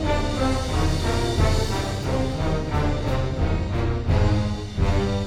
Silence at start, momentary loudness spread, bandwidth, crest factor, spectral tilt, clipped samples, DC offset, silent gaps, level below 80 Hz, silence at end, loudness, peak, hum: 0 s; 4 LU; 13 kHz; 14 dB; -6 dB/octave; under 0.1%; under 0.1%; none; -28 dBFS; 0 s; -24 LUFS; -6 dBFS; none